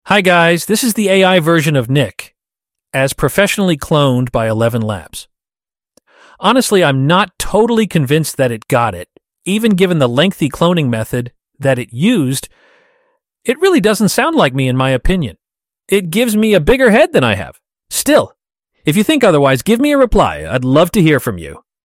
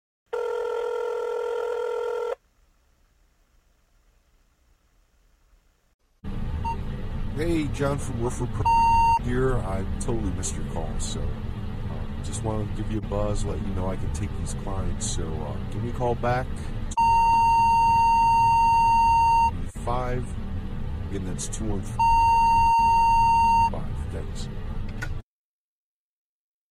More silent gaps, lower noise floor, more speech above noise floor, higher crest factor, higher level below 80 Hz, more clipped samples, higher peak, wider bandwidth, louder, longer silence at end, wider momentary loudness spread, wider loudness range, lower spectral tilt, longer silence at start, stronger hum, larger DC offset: second, none vs 5.94-5.99 s; first, under -90 dBFS vs -63 dBFS; first, over 78 dB vs 37 dB; about the same, 14 dB vs 14 dB; about the same, -34 dBFS vs -32 dBFS; neither; first, 0 dBFS vs -10 dBFS; first, 16.5 kHz vs 14.5 kHz; first, -13 LUFS vs -24 LUFS; second, 0.3 s vs 1.5 s; second, 11 LU vs 15 LU; second, 3 LU vs 13 LU; about the same, -5 dB/octave vs -5.5 dB/octave; second, 0.05 s vs 0.3 s; neither; neither